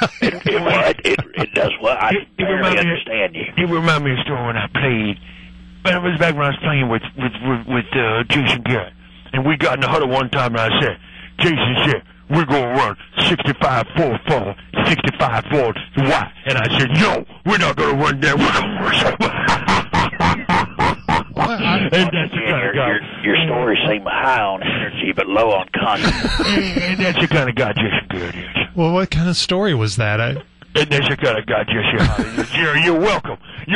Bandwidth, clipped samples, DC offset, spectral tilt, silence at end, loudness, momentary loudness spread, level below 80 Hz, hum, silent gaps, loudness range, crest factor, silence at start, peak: 11 kHz; under 0.1%; under 0.1%; -5.5 dB/octave; 0 s; -17 LUFS; 5 LU; -38 dBFS; none; none; 2 LU; 14 dB; 0 s; -4 dBFS